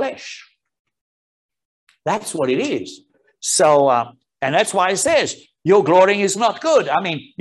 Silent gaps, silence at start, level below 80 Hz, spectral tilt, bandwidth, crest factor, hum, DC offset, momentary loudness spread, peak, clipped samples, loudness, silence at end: 0.79-0.85 s, 1.01-1.49 s, 1.65-1.87 s; 0 s; -66 dBFS; -3.5 dB/octave; 12.5 kHz; 18 dB; none; under 0.1%; 14 LU; -2 dBFS; under 0.1%; -17 LUFS; 0.2 s